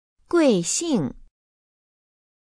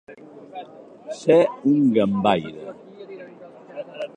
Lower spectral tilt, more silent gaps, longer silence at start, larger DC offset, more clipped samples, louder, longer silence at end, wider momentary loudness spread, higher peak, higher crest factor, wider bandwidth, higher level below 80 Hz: second, -4.5 dB/octave vs -7 dB/octave; neither; first, 0.3 s vs 0.1 s; neither; neither; about the same, -22 LUFS vs -20 LUFS; first, 1.2 s vs 0.1 s; second, 7 LU vs 24 LU; about the same, -6 dBFS vs -4 dBFS; about the same, 18 dB vs 20 dB; about the same, 10 kHz vs 9.4 kHz; first, -54 dBFS vs -62 dBFS